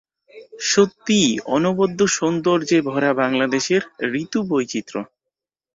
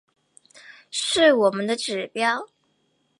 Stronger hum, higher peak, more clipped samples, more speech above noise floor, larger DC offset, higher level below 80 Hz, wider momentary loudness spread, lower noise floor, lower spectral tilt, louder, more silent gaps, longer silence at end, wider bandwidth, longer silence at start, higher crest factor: neither; about the same, -2 dBFS vs -4 dBFS; neither; first, 65 dB vs 47 dB; neither; first, -60 dBFS vs -68 dBFS; about the same, 9 LU vs 11 LU; first, -84 dBFS vs -69 dBFS; first, -4 dB/octave vs -2.5 dB/octave; first, -19 LUFS vs -22 LUFS; neither; about the same, 0.7 s vs 0.75 s; second, 7.8 kHz vs 11.5 kHz; second, 0.35 s vs 0.7 s; about the same, 18 dB vs 20 dB